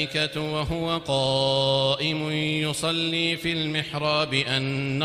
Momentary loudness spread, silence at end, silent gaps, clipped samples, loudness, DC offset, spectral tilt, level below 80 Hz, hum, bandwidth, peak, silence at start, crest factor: 5 LU; 0 s; none; under 0.1%; -24 LUFS; under 0.1%; -4.5 dB/octave; -50 dBFS; none; 15.5 kHz; -8 dBFS; 0 s; 18 dB